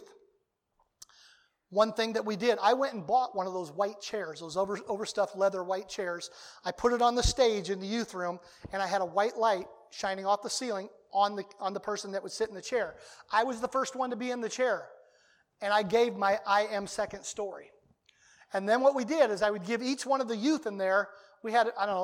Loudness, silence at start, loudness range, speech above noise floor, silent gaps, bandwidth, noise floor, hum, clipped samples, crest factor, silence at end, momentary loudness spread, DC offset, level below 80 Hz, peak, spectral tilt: -31 LUFS; 0 s; 3 LU; 46 dB; none; 16 kHz; -76 dBFS; none; under 0.1%; 20 dB; 0 s; 11 LU; under 0.1%; -52 dBFS; -12 dBFS; -3.5 dB/octave